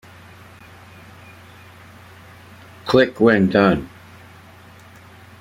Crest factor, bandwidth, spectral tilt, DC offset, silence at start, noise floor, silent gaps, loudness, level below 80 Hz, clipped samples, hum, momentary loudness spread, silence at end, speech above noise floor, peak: 22 dB; 15 kHz; -7 dB/octave; under 0.1%; 2.85 s; -44 dBFS; none; -16 LUFS; -52 dBFS; under 0.1%; none; 17 LU; 1.55 s; 29 dB; 0 dBFS